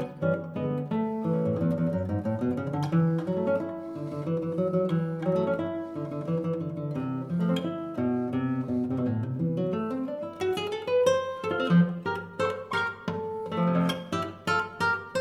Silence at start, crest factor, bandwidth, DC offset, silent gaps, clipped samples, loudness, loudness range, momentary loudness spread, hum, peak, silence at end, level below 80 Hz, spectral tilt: 0 s; 18 dB; 12 kHz; under 0.1%; none; under 0.1%; -29 LUFS; 2 LU; 7 LU; none; -10 dBFS; 0 s; -66 dBFS; -7.5 dB/octave